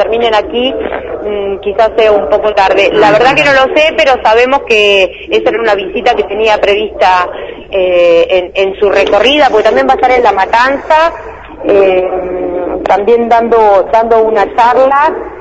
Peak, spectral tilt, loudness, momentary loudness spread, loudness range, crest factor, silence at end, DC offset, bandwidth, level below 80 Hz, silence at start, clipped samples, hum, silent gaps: 0 dBFS; -4 dB/octave; -8 LUFS; 9 LU; 3 LU; 8 dB; 0 s; under 0.1%; 11 kHz; -36 dBFS; 0 s; 1%; none; none